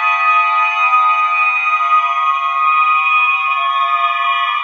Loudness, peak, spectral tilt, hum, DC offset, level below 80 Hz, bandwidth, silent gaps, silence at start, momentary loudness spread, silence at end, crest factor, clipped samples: -12 LUFS; -2 dBFS; 7 dB/octave; none; under 0.1%; under -90 dBFS; 6.6 kHz; none; 0 s; 3 LU; 0 s; 12 dB; under 0.1%